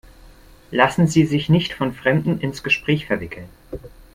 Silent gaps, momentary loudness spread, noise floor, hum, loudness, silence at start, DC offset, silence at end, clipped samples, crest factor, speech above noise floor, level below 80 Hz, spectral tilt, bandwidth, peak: none; 20 LU; -46 dBFS; none; -19 LUFS; 0.25 s; under 0.1%; 0.25 s; under 0.1%; 20 dB; 26 dB; -46 dBFS; -6 dB/octave; 15 kHz; 0 dBFS